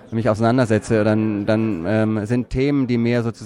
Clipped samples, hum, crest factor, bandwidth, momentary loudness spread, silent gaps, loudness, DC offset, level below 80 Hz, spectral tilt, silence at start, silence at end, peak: under 0.1%; none; 14 dB; 11 kHz; 3 LU; none; -19 LUFS; under 0.1%; -42 dBFS; -7.5 dB/octave; 0.05 s; 0 s; -4 dBFS